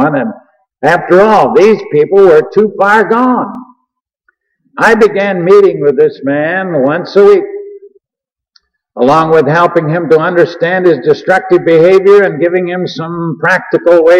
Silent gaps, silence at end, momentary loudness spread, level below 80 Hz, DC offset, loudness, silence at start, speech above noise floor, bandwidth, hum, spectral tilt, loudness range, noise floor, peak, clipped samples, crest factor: none; 0 s; 10 LU; -50 dBFS; under 0.1%; -8 LUFS; 0 s; 76 dB; 9.6 kHz; none; -7 dB/octave; 3 LU; -83 dBFS; 0 dBFS; 0.4%; 8 dB